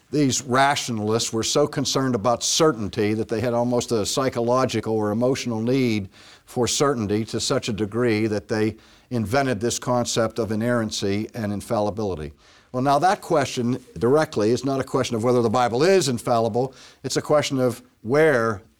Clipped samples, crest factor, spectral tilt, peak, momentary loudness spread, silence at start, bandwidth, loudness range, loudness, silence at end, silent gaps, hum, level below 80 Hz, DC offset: under 0.1%; 14 dB; -4.5 dB/octave; -8 dBFS; 8 LU; 0.1 s; 18.5 kHz; 3 LU; -22 LUFS; 0.2 s; none; none; -54 dBFS; under 0.1%